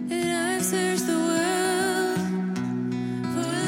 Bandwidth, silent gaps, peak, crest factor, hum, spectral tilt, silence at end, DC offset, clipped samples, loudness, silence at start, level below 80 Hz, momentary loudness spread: 17 kHz; none; -12 dBFS; 14 dB; none; -4 dB/octave; 0 s; under 0.1%; under 0.1%; -25 LUFS; 0 s; -70 dBFS; 5 LU